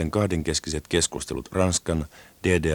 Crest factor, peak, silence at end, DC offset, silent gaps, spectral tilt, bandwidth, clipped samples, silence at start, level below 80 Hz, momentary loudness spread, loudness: 18 dB; -6 dBFS; 0 s; under 0.1%; none; -4 dB/octave; 19.5 kHz; under 0.1%; 0 s; -40 dBFS; 7 LU; -25 LUFS